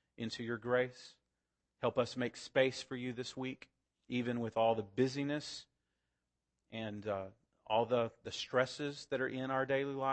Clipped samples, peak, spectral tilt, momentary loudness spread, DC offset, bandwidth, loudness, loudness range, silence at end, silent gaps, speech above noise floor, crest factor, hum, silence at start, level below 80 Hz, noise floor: under 0.1%; -16 dBFS; -5 dB/octave; 11 LU; under 0.1%; 8.4 kHz; -37 LUFS; 3 LU; 0 s; none; 51 dB; 22 dB; none; 0.2 s; -76 dBFS; -88 dBFS